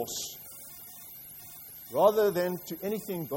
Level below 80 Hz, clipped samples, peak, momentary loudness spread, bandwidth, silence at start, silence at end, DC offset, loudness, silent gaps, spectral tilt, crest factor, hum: -68 dBFS; under 0.1%; -12 dBFS; 19 LU; 16.5 kHz; 0 s; 0 s; under 0.1%; -29 LUFS; none; -4.5 dB/octave; 20 dB; none